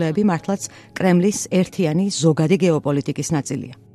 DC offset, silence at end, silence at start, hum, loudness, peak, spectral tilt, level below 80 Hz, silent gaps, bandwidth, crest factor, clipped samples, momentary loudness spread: under 0.1%; 0.2 s; 0 s; none; -20 LUFS; -4 dBFS; -6 dB/octave; -56 dBFS; none; 13 kHz; 16 dB; under 0.1%; 9 LU